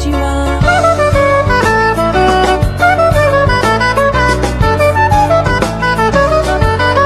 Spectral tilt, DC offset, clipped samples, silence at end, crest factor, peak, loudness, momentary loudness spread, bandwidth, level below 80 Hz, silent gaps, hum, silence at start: -5.5 dB/octave; under 0.1%; under 0.1%; 0 s; 10 dB; 0 dBFS; -10 LUFS; 3 LU; 14 kHz; -20 dBFS; none; none; 0 s